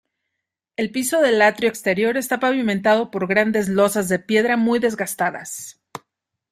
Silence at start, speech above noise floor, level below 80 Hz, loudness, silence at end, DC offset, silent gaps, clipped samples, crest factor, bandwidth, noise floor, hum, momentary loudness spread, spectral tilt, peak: 0.8 s; 62 dB; -62 dBFS; -19 LUFS; 0.55 s; under 0.1%; none; under 0.1%; 18 dB; 16 kHz; -81 dBFS; none; 15 LU; -4.5 dB/octave; -2 dBFS